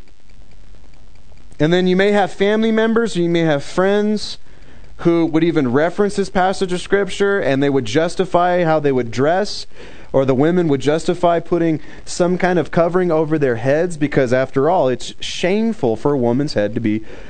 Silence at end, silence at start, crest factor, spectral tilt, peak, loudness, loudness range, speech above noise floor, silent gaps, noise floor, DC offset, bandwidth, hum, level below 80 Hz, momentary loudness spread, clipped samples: 0 s; 0.15 s; 16 dB; -6 dB/octave; 0 dBFS; -17 LUFS; 1 LU; 28 dB; none; -45 dBFS; 4%; 9.4 kHz; none; -44 dBFS; 6 LU; under 0.1%